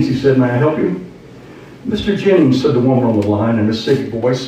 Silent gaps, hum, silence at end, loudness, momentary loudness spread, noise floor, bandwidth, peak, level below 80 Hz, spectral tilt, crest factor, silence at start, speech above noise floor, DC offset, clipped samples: none; none; 0 s; -14 LUFS; 9 LU; -36 dBFS; 9.4 kHz; -2 dBFS; -44 dBFS; -7.5 dB/octave; 12 dB; 0 s; 23 dB; under 0.1%; under 0.1%